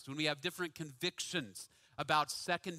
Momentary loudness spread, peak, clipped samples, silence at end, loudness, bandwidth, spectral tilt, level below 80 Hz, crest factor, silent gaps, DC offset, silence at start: 14 LU; -16 dBFS; under 0.1%; 0 s; -37 LUFS; 16 kHz; -3 dB/octave; -76 dBFS; 24 dB; none; under 0.1%; 0 s